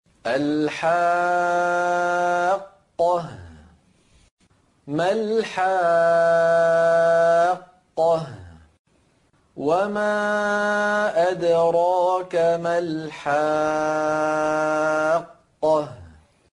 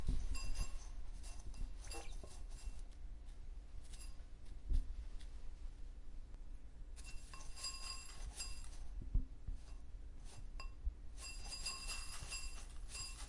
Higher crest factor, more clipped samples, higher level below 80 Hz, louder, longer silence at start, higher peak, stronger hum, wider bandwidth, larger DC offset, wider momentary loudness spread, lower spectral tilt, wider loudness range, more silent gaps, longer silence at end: second, 12 dB vs 20 dB; neither; second, -62 dBFS vs -46 dBFS; first, -21 LUFS vs -51 LUFS; first, 0.25 s vs 0 s; first, -10 dBFS vs -26 dBFS; neither; about the same, 11 kHz vs 11.5 kHz; neither; second, 8 LU vs 12 LU; first, -5 dB/octave vs -2.5 dB/octave; about the same, 6 LU vs 5 LU; first, 4.31-4.37 s, 8.79-8.85 s vs none; first, 0.45 s vs 0 s